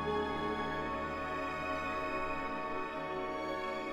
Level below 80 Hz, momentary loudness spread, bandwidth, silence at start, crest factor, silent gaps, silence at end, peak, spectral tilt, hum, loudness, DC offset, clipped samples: -54 dBFS; 3 LU; 16 kHz; 0 s; 14 dB; none; 0 s; -24 dBFS; -5.5 dB/octave; none; -37 LUFS; under 0.1%; under 0.1%